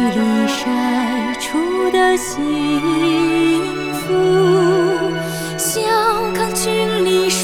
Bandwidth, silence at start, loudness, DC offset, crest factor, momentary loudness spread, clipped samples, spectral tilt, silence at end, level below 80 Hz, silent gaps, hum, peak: 18.5 kHz; 0 s; -16 LUFS; under 0.1%; 12 dB; 6 LU; under 0.1%; -4 dB/octave; 0 s; -46 dBFS; none; none; -4 dBFS